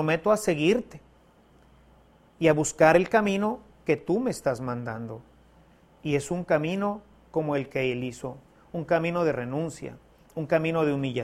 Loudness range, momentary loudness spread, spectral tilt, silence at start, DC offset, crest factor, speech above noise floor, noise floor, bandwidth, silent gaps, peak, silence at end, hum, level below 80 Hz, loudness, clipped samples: 5 LU; 16 LU; -5.5 dB/octave; 0 s; under 0.1%; 22 dB; 32 dB; -58 dBFS; 15.5 kHz; none; -4 dBFS; 0 s; none; -58 dBFS; -26 LUFS; under 0.1%